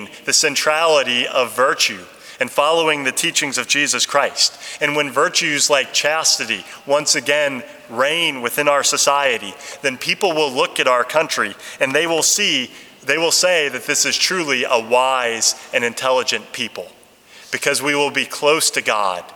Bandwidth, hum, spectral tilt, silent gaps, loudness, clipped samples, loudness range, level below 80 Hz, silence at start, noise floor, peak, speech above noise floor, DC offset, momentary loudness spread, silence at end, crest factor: over 20 kHz; none; -1 dB/octave; none; -17 LUFS; under 0.1%; 3 LU; -70 dBFS; 0 s; -45 dBFS; 0 dBFS; 27 dB; under 0.1%; 8 LU; 0 s; 18 dB